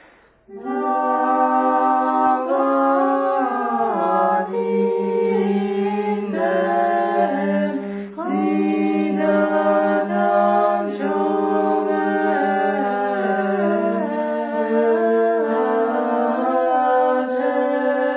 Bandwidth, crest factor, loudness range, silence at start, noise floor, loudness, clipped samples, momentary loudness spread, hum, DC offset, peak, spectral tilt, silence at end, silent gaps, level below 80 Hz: 4 kHz; 14 dB; 2 LU; 0.5 s; -51 dBFS; -19 LUFS; under 0.1%; 5 LU; none; under 0.1%; -4 dBFS; -10.5 dB/octave; 0 s; none; -66 dBFS